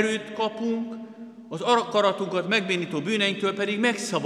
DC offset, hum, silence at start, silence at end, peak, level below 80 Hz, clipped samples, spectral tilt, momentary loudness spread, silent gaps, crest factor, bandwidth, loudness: under 0.1%; none; 0 s; 0 s; -8 dBFS; -82 dBFS; under 0.1%; -4 dB/octave; 13 LU; none; 18 dB; 13 kHz; -25 LUFS